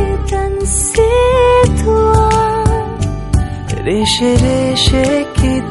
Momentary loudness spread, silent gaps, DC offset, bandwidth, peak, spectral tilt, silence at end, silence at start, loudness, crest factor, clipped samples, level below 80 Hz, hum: 7 LU; none; under 0.1%; 12 kHz; 0 dBFS; -5 dB/octave; 0 s; 0 s; -13 LUFS; 12 dB; under 0.1%; -20 dBFS; none